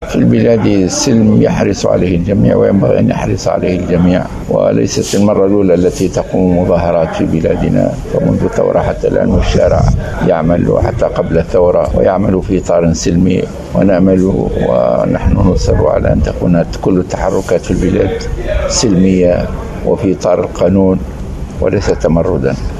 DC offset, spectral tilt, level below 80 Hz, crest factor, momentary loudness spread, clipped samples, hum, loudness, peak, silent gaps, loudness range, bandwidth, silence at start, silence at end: under 0.1%; -6.5 dB/octave; -22 dBFS; 10 dB; 5 LU; under 0.1%; none; -11 LUFS; 0 dBFS; none; 2 LU; 13 kHz; 0 s; 0 s